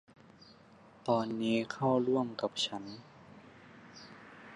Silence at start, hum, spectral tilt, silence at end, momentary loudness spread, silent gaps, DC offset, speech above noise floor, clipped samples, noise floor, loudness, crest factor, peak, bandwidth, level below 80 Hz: 0.4 s; none; -5.5 dB/octave; 0 s; 25 LU; none; under 0.1%; 26 dB; under 0.1%; -59 dBFS; -33 LUFS; 20 dB; -16 dBFS; 11 kHz; -76 dBFS